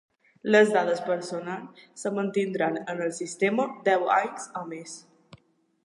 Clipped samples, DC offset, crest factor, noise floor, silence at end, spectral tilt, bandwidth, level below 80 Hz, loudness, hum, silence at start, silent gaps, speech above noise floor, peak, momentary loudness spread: under 0.1%; under 0.1%; 20 dB; -59 dBFS; 0.85 s; -4.5 dB/octave; 11.5 kHz; -78 dBFS; -26 LUFS; none; 0.45 s; none; 33 dB; -8 dBFS; 17 LU